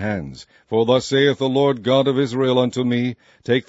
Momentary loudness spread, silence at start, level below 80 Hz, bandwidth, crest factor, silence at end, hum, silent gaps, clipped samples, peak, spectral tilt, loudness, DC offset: 9 LU; 0 s; -56 dBFS; 8 kHz; 16 dB; 0.05 s; none; none; under 0.1%; -2 dBFS; -6 dB/octave; -19 LUFS; under 0.1%